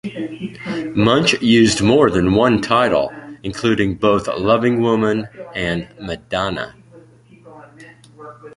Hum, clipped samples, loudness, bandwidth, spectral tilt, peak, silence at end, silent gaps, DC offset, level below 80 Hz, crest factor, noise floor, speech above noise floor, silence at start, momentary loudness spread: none; under 0.1%; -17 LUFS; 11.5 kHz; -5.5 dB/octave; 0 dBFS; 0.05 s; none; under 0.1%; -42 dBFS; 18 dB; -45 dBFS; 29 dB; 0.05 s; 15 LU